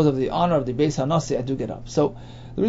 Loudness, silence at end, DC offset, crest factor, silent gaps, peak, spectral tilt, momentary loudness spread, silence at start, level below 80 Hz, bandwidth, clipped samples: -23 LUFS; 0 s; under 0.1%; 16 dB; none; -6 dBFS; -7 dB/octave; 8 LU; 0 s; -44 dBFS; 8 kHz; under 0.1%